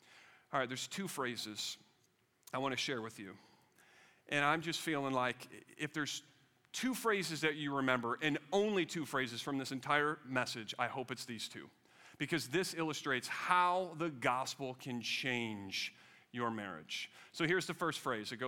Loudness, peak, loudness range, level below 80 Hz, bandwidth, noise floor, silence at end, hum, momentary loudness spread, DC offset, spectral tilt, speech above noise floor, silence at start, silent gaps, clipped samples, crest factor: -38 LUFS; -16 dBFS; 5 LU; -82 dBFS; 17.5 kHz; -75 dBFS; 0 s; none; 10 LU; under 0.1%; -3.5 dB/octave; 37 dB; 0.1 s; none; under 0.1%; 24 dB